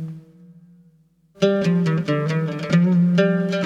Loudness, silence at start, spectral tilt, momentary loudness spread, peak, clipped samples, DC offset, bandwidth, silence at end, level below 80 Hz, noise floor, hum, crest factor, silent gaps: -19 LUFS; 0 s; -7.5 dB/octave; 7 LU; -4 dBFS; under 0.1%; under 0.1%; 7.6 kHz; 0 s; -62 dBFS; -57 dBFS; none; 18 dB; none